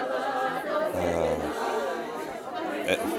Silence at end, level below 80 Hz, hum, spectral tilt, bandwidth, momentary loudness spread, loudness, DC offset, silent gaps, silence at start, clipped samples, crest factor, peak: 0 s; -54 dBFS; none; -4.5 dB/octave; 16.5 kHz; 7 LU; -29 LUFS; under 0.1%; none; 0 s; under 0.1%; 18 dB; -12 dBFS